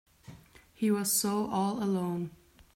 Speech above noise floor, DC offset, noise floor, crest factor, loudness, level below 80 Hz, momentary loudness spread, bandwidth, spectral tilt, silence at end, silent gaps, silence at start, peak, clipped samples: 25 dB; under 0.1%; -55 dBFS; 14 dB; -30 LUFS; -66 dBFS; 9 LU; 16 kHz; -4.5 dB/octave; 0.45 s; none; 0.3 s; -18 dBFS; under 0.1%